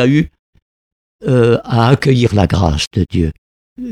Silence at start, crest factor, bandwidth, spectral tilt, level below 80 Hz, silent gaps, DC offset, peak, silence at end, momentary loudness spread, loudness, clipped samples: 0 s; 14 dB; 12 kHz; -7 dB/octave; -30 dBFS; 0.39-0.53 s, 0.62-1.19 s, 2.87-2.91 s, 3.38-3.76 s; under 0.1%; 0 dBFS; 0 s; 10 LU; -14 LUFS; under 0.1%